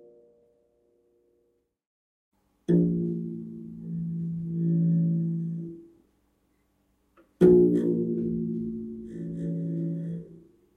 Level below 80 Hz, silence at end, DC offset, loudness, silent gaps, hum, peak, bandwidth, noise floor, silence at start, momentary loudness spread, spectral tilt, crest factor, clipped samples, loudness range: -58 dBFS; 0.35 s; under 0.1%; -27 LUFS; none; none; -6 dBFS; 3.6 kHz; -72 dBFS; 2.7 s; 18 LU; -11.5 dB/octave; 22 dB; under 0.1%; 6 LU